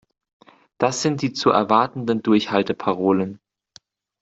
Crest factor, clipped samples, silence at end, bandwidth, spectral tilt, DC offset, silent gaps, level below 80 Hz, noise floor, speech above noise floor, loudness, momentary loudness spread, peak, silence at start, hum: 18 dB; under 0.1%; 0.85 s; 8 kHz; -5 dB/octave; under 0.1%; none; -62 dBFS; -53 dBFS; 34 dB; -20 LUFS; 6 LU; -2 dBFS; 0.8 s; none